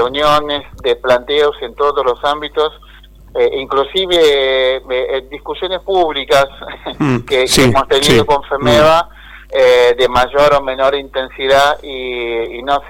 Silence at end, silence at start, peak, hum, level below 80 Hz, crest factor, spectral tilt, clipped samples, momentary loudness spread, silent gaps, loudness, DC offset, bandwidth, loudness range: 0 s; 0 s; 0 dBFS; none; -36 dBFS; 12 dB; -4 dB/octave; under 0.1%; 10 LU; none; -13 LUFS; under 0.1%; 17 kHz; 4 LU